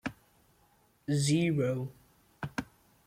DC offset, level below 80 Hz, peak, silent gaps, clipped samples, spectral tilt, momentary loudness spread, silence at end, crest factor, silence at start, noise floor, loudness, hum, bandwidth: under 0.1%; -64 dBFS; -18 dBFS; none; under 0.1%; -5.5 dB/octave; 17 LU; 0.45 s; 16 dB; 0.05 s; -67 dBFS; -32 LUFS; none; 15.5 kHz